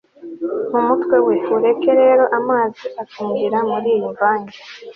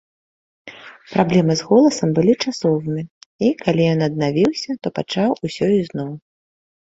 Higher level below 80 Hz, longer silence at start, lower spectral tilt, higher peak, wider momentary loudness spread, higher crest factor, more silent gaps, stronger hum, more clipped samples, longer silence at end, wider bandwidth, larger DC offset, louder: second, -66 dBFS vs -56 dBFS; second, 0.2 s vs 0.65 s; about the same, -7.5 dB/octave vs -6.5 dB/octave; about the same, -4 dBFS vs -2 dBFS; about the same, 15 LU vs 13 LU; about the same, 14 dB vs 18 dB; second, none vs 3.10-3.39 s; neither; neither; second, 0.05 s vs 0.65 s; second, 6.2 kHz vs 8 kHz; neither; about the same, -17 LUFS vs -18 LUFS